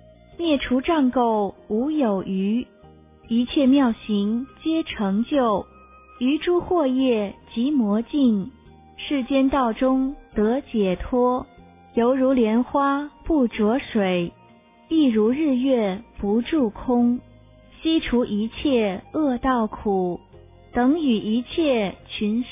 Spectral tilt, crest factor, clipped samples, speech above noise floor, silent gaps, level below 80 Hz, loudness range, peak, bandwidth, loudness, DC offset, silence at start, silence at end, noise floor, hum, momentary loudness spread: -10.5 dB/octave; 12 dB; under 0.1%; 31 dB; none; -46 dBFS; 1 LU; -10 dBFS; 3.8 kHz; -22 LUFS; under 0.1%; 0.4 s; 0 s; -52 dBFS; none; 7 LU